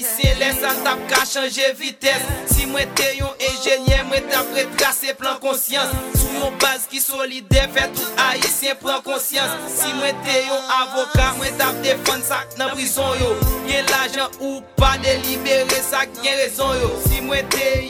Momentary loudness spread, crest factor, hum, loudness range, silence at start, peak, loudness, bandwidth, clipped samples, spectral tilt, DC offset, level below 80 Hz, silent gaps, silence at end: 4 LU; 18 dB; none; 1 LU; 0 s; -2 dBFS; -18 LUFS; 19 kHz; under 0.1%; -3 dB/octave; under 0.1%; -28 dBFS; none; 0 s